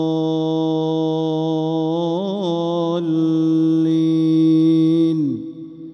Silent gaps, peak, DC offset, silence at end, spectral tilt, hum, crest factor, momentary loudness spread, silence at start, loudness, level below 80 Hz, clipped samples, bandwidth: none; -8 dBFS; under 0.1%; 0 s; -9 dB/octave; none; 10 dB; 7 LU; 0 s; -18 LUFS; -66 dBFS; under 0.1%; 6.6 kHz